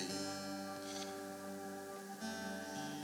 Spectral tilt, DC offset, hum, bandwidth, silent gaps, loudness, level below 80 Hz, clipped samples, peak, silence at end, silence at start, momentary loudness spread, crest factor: -3.5 dB/octave; under 0.1%; none; over 20 kHz; none; -45 LUFS; -86 dBFS; under 0.1%; -28 dBFS; 0 s; 0 s; 5 LU; 16 dB